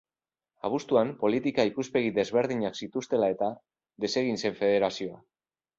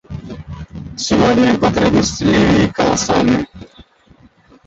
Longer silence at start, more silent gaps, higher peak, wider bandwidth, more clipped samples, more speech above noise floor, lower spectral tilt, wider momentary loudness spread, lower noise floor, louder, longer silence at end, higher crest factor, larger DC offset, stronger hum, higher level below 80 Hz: first, 0.65 s vs 0.1 s; neither; second, -10 dBFS vs -2 dBFS; about the same, 7.8 kHz vs 8.2 kHz; neither; first, over 62 dB vs 35 dB; about the same, -5 dB/octave vs -5 dB/octave; second, 9 LU vs 18 LU; first, under -90 dBFS vs -48 dBFS; second, -28 LUFS vs -14 LUFS; second, 0.6 s vs 0.85 s; about the same, 18 dB vs 14 dB; neither; neither; second, -68 dBFS vs -36 dBFS